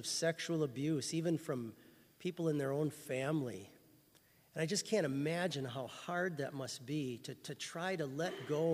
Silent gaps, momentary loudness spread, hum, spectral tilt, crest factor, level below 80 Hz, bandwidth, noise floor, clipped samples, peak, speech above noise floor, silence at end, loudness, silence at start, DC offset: none; 9 LU; none; -5 dB/octave; 18 dB; -80 dBFS; 15.5 kHz; -68 dBFS; under 0.1%; -22 dBFS; 30 dB; 0 s; -39 LUFS; 0 s; under 0.1%